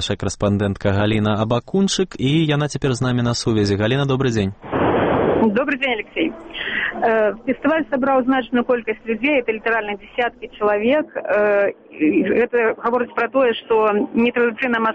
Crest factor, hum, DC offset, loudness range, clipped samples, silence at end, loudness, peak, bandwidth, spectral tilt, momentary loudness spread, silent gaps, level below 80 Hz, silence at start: 12 dB; none; under 0.1%; 1 LU; under 0.1%; 0 s; -19 LUFS; -6 dBFS; 8.8 kHz; -6 dB/octave; 6 LU; none; -46 dBFS; 0 s